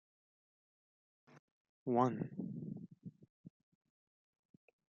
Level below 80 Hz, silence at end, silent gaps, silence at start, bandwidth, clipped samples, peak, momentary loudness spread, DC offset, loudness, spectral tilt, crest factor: -88 dBFS; 1.4 s; 1.39-1.86 s, 3.30-3.44 s; 1.3 s; 6.6 kHz; under 0.1%; -20 dBFS; 21 LU; under 0.1%; -40 LUFS; -8.5 dB/octave; 26 dB